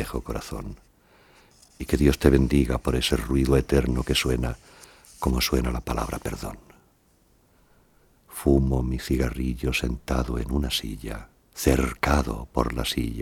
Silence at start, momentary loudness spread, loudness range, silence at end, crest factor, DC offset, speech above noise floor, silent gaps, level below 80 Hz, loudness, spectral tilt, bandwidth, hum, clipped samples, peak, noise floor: 0 s; 15 LU; 7 LU; 0 s; 24 dB; under 0.1%; 38 dB; none; -32 dBFS; -25 LUFS; -5.5 dB/octave; 17.5 kHz; none; under 0.1%; 0 dBFS; -62 dBFS